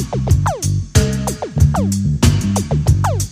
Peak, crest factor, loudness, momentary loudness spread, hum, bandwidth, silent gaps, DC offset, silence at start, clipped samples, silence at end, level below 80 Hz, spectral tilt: 0 dBFS; 16 dB; -16 LUFS; 5 LU; none; 15.5 kHz; none; under 0.1%; 0 s; under 0.1%; 0 s; -26 dBFS; -6 dB/octave